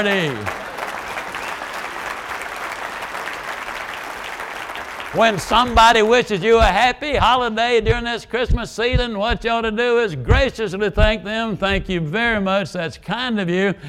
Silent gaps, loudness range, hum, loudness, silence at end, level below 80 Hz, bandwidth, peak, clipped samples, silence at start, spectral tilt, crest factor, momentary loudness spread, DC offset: none; 11 LU; none; -19 LUFS; 0 s; -30 dBFS; 16.5 kHz; -2 dBFS; under 0.1%; 0 s; -5 dB/octave; 18 dB; 13 LU; under 0.1%